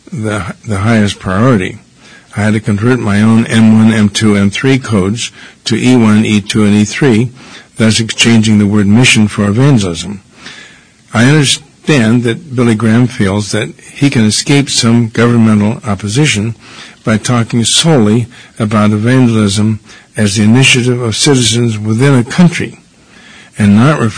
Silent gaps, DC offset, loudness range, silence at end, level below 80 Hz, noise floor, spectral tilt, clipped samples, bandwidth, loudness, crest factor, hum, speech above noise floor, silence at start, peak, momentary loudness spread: none; 0.7%; 2 LU; 0 s; -42 dBFS; -39 dBFS; -5 dB/octave; 1%; 11 kHz; -9 LUFS; 10 dB; none; 30 dB; 0.1 s; 0 dBFS; 12 LU